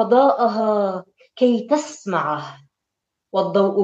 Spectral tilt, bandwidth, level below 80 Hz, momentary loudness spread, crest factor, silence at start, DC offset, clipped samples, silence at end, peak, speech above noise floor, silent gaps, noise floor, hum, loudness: -6 dB/octave; 8.4 kHz; -76 dBFS; 10 LU; 18 dB; 0 s; under 0.1%; under 0.1%; 0 s; -2 dBFS; 63 dB; none; -81 dBFS; none; -20 LUFS